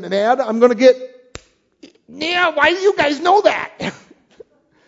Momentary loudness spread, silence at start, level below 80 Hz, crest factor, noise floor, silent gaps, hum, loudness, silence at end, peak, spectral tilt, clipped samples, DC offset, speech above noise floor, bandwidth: 13 LU; 0 s; -56 dBFS; 18 dB; -47 dBFS; none; none; -15 LUFS; 0.95 s; 0 dBFS; -4 dB/octave; under 0.1%; under 0.1%; 32 dB; 7.8 kHz